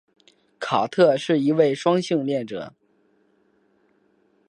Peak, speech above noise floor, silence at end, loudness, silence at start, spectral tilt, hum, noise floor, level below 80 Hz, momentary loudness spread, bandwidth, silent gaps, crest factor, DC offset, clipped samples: -6 dBFS; 43 dB; 1.8 s; -21 LUFS; 0.6 s; -6 dB/octave; none; -63 dBFS; -72 dBFS; 15 LU; 11 kHz; none; 18 dB; under 0.1%; under 0.1%